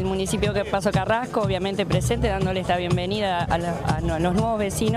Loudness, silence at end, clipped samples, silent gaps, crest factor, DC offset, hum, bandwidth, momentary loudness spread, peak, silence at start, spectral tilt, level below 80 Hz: -23 LUFS; 0 s; under 0.1%; none; 12 dB; under 0.1%; none; 15.5 kHz; 2 LU; -10 dBFS; 0 s; -5.5 dB/octave; -36 dBFS